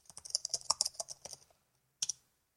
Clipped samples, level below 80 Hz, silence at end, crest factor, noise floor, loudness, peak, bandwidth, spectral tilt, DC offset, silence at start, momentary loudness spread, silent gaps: under 0.1%; -78 dBFS; 0.45 s; 32 dB; -76 dBFS; -36 LUFS; -8 dBFS; 16.5 kHz; 2 dB/octave; under 0.1%; 0.25 s; 16 LU; none